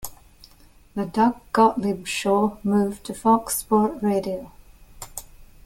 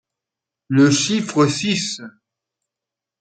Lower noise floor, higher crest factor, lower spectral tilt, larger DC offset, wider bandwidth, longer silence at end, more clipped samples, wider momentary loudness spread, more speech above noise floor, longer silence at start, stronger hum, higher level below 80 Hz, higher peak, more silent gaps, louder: second, -52 dBFS vs -86 dBFS; about the same, 18 dB vs 18 dB; about the same, -5 dB/octave vs -4.5 dB/octave; neither; first, 17 kHz vs 9.4 kHz; second, 0.2 s vs 1.1 s; neither; first, 17 LU vs 9 LU; second, 30 dB vs 69 dB; second, 0 s vs 0.7 s; neither; first, -50 dBFS vs -62 dBFS; about the same, -4 dBFS vs -4 dBFS; neither; second, -22 LUFS vs -18 LUFS